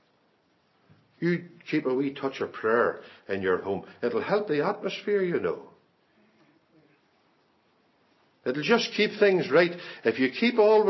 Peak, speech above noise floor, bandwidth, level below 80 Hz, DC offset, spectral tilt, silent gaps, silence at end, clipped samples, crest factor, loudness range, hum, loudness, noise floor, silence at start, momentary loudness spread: -8 dBFS; 42 dB; 6.2 kHz; -70 dBFS; under 0.1%; -6 dB/octave; none; 0 s; under 0.1%; 20 dB; 8 LU; none; -26 LUFS; -67 dBFS; 1.2 s; 10 LU